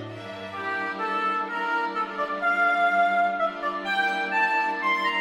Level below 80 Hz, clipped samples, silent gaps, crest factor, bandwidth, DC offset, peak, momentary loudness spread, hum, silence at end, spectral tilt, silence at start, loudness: -70 dBFS; under 0.1%; none; 14 dB; 13 kHz; under 0.1%; -12 dBFS; 8 LU; none; 0 s; -4 dB/octave; 0 s; -24 LUFS